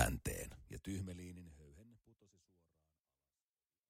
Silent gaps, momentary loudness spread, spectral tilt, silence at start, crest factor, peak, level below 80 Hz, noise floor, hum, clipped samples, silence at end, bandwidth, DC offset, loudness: none; 20 LU; -4.5 dB/octave; 0 s; 30 dB; -18 dBFS; -56 dBFS; under -90 dBFS; none; under 0.1%; 1.8 s; 16 kHz; under 0.1%; -46 LUFS